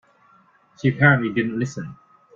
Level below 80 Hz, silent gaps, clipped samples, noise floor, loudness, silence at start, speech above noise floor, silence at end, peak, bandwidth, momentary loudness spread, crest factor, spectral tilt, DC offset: -58 dBFS; none; under 0.1%; -57 dBFS; -20 LUFS; 0.85 s; 37 dB; 0.45 s; -2 dBFS; 7.4 kHz; 17 LU; 20 dB; -7 dB/octave; under 0.1%